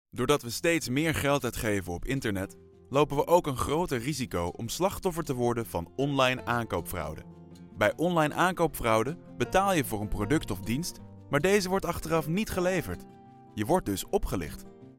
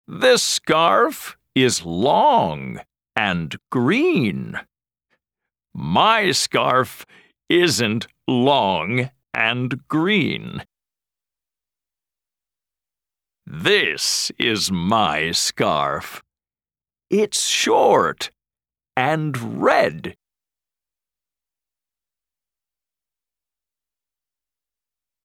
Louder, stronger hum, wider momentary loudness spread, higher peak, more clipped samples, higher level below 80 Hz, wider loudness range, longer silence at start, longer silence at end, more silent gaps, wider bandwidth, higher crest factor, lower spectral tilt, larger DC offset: second, -29 LUFS vs -19 LUFS; neither; second, 11 LU vs 14 LU; second, -8 dBFS vs -2 dBFS; neither; first, -46 dBFS vs -58 dBFS; second, 2 LU vs 6 LU; about the same, 0.15 s vs 0.1 s; second, 0.05 s vs 5.1 s; neither; about the same, 17 kHz vs 18.5 kHz; about the same, 20 dB vs 20 dB; first, -5 dB/octave vs -3.5 dB/octave; neither